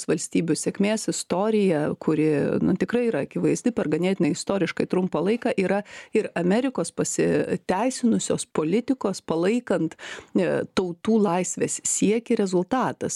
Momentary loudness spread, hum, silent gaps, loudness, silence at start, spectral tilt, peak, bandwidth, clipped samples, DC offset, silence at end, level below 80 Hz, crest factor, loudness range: 4 LU; none; none; -24 LUFS; 0 s; -5 dB/octave; -8 dBFS; 13 kHz; under 0.1%; under 0.1%; 0 s; -60 dBFS; 16 dB; 1 LU